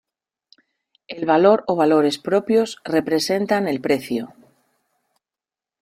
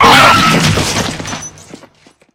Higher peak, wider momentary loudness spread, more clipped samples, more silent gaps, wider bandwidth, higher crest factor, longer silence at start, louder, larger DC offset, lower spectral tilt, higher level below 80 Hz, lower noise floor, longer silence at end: second, -4 dBFS vs 0 dBFS; second, 12 LU vs 19 LU; second, under 0.1% vs 2%; neither; second, 15.5 kHz vs over 20 kHz; first, 18 dB vs 12 dB; first, 1.1 s vs 0 s; second, -19 LUFS vs -9 LUFS; neither; first, -5 dB/octave vs -3.5 dB/octave; second, -64 dBFS vs -34 dBFS; first, -90 dBFS vs -45 dBFS; first, 1.55 s vs 0.85 s